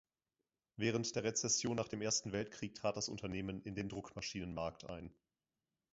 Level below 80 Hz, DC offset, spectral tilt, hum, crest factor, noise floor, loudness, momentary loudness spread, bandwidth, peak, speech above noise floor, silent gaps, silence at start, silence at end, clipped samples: -64 dBFS; under 0.1%; -4.5 dB/octave; none; 20 dB; under -90 dBFS; -40 LUFS; 12 LU; 7.6 kHz; -22 dBFS; over 49 dB; none; 0.8 s; 0.8 s; under 0.1%